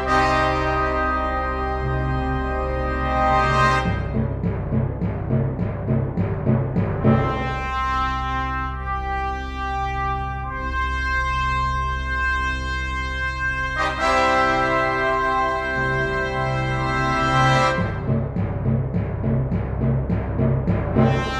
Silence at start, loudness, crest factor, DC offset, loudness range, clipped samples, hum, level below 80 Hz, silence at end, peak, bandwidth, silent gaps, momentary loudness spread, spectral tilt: 0 s; -22 LUFS; 18 dB; under 0.1%; 4 LU; under 0.1%; none; -30 dBFS; 0 s; -4 dBFS; 9.8 kHz; none; 7 LU; -6.5 dB/octave